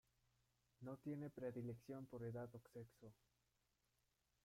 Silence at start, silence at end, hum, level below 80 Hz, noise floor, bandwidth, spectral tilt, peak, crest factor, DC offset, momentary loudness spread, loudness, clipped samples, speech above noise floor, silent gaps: 0.8 s; 1.3 s; none; -84 dBFS; -87 dBFS; 16 kHz; -8.5 dB/octave; -38 dBFS; 16 dB; under 0.1%; 11 LU; -54 LUFS; under 0.1%; 34 dB; none